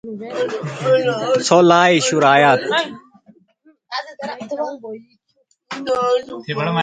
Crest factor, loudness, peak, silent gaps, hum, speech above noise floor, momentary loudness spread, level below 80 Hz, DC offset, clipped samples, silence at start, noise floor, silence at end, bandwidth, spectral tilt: 18 dB; -16 LUFS; 0 dBFS; none; none; 47 dB; 17 LU; -64 dBFS; under 0.1%; under 0.1%; 0.05 s; -64 dBFS; 0 s; 9.4 kHz; -4.5 dB/octave